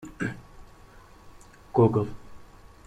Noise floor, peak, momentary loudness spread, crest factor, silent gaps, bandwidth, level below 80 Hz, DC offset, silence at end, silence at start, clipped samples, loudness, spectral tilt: -51 dBFS; -8 dBFS; 23 LU; 22 dB; none; 10 kHz; -52 dBFS; under 0.1%; 0.45 s; 0 s; under 0.1%; -26 LUFS; -8.5 dB/octave